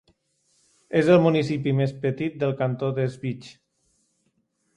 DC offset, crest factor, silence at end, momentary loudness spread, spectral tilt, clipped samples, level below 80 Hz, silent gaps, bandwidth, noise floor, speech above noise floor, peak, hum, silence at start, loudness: under 0.1%; 18 dB; 1.25 s; 12 LU; -8 dB/octave; under 0.1%; -62 dBFS; none; 11 kHz; -71 dBFS; 48 dB; -6 dBFS; none; 0.9 s; -23 LUFS